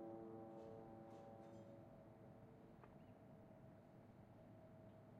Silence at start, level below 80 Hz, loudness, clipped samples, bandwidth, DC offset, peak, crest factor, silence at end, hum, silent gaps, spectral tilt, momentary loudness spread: 0 s; -80 dBFS; -62 LUFS; under 0.1%; 7.6 kHz; under 0.1%; -44 dBFS; 16 dB; 0 s; none; none; -8 dB/octave; 8 LU